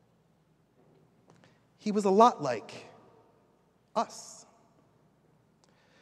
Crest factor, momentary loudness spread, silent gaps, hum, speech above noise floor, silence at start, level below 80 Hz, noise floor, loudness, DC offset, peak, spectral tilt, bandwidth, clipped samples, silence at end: 26 dB; 26 LU; none; none; 41 dB; 1.85 s; -82 dBFS; -68 dBFS; -28 LUFS; under 0.1%; -8 dBFS; -5.5 dB/octave; 12.5 kHz; under 0.1%; 1.7 s